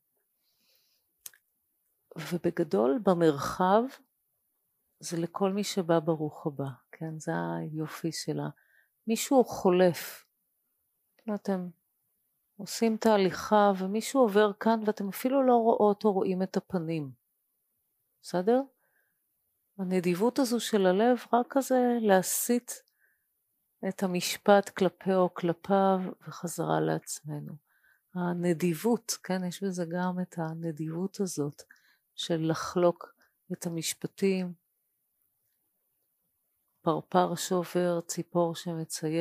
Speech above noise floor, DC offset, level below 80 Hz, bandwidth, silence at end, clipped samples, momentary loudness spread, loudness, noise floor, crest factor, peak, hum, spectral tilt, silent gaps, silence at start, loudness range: 50 dB; under 0.1%; -72 dBFS; 15.5 kHz; 0 s; under 0.1%; 15 LU; -29 LUFS; -78 dBFS; 22 dB; -6 dBFS; none; -5.5 dB/octave; none; 2.15 s; 7 LU